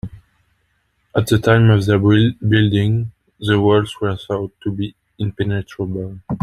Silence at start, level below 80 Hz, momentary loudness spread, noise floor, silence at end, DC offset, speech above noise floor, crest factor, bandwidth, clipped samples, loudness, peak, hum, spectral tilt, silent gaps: 0.05 s; -44 dBFS; 14 LU; -65 dBFS; 0.05 s; under 0.1%; 49 dB; 16 dB; 13.5 kHz; under 0.1%; -17 LUFS; 0 dBFS; none; -7.5 dB/octave; none